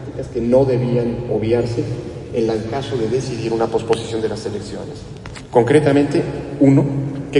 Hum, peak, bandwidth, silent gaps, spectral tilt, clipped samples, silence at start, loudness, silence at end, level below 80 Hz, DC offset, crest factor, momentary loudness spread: none; -2 dBFS; 11 kHz; none; -7.5 dB/octave; under 0.1%; 0 s; -18 LUFS; 0 s; -42 dBFS; under 0.1%; 16 dB; 14 LU